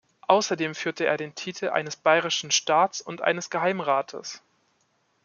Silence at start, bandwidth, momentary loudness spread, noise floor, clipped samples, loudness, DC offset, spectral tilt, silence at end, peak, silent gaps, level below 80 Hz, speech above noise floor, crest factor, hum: 0.3 s; 7.4 kHz; 11 LU; -69 dBFS; under 0.1%; -25 LUFS; under 0.1%; -2.5 dB/octave; 0.85 s; -2 dBFS; none; -78 dBFS; 44 dB; 24 dB; none